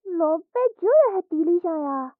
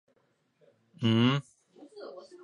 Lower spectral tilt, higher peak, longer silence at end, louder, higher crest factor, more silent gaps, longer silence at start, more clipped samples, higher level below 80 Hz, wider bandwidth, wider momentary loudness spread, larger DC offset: about the same, -6 dB/octave vs -7 dB/octave; first, -8 dBFS vs -12 dBFS; second, 0.1 s vs 0.25 s; first, -22 LUFS vs -28 LUFS; second, 14 dB vs 20 dB; neither; second, 0.05 s vs 1 s; neither; second, -84 dBFS vs -72 dBFS; second, 2.7 kHz vs 10 kHz; second, 7 LU vs 21 LU; neither